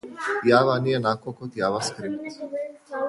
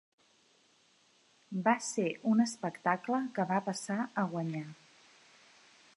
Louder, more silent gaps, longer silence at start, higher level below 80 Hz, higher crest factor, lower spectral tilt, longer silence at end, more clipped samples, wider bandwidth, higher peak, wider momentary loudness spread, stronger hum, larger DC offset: first, -24 LUFS vs -33 LUFS; neither; second, 0.05 s vs 1.5 s; first, -66 dBFS vs -86 dBFS; about the same, 20 dB vs 22 dB; about the same, -5 dB/octave vs -5.5 dB/octave; second, 0 s vs 1.2 s; neither; about the same, 11.5 kHz vs 11.5 kHz; first, -4 dBFS vs -14 dBFS; first, 14 LU vs 9 LU; neither; neither